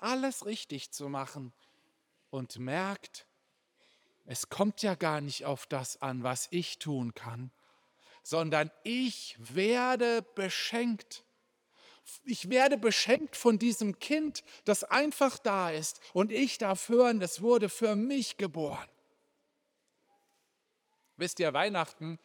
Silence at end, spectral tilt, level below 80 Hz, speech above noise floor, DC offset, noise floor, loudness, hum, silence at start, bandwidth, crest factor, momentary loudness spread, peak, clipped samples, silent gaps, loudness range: 0.1 s; -4 dB/octave; -82 dBFS; 47 dB; under 0.1%; -79 dBFS; -31 LUFS; none; 0 s; over 20 kHz; 22 dB; 15 LU; -12 dBFS; under 0.1%; none; 10 LU